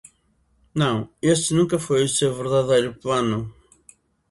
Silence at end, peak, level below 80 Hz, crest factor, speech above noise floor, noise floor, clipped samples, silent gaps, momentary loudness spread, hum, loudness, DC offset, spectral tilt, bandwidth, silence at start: 0.8 s; -6 dBFS; -54 dBFS; 18 dB; 43 dB; -64 dBFS; under 0.1%; none; 7 LU; none; -21 LUFS; under 0.1%; -5 dB/octave; 11.5 kHz; 0.75 s